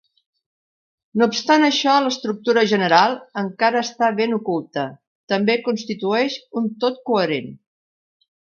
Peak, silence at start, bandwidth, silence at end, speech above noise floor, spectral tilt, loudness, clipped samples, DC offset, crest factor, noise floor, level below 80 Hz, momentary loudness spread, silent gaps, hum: 0 dBFS; 1.15 s; 7.2 kHz; 1.05 s; over 71 dB; -4.5 dB/octave; -19 LUFS; under 0.1%; under 0.1%; 20 dB; under -90 dBFS; -70 dBFS; 11 LU; 5.07-5.27 s; none